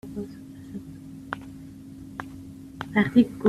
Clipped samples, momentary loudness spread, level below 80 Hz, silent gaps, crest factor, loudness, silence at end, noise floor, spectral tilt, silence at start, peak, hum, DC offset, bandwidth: under 0.1%; 22 LU; -56 dBFS; none; 22 dB; -27 LUFS; 0 s; -42 dBFS; -7.5 dB/octave; 0.05 s; -6 dBFS; none; under 0.1%; 13 kHz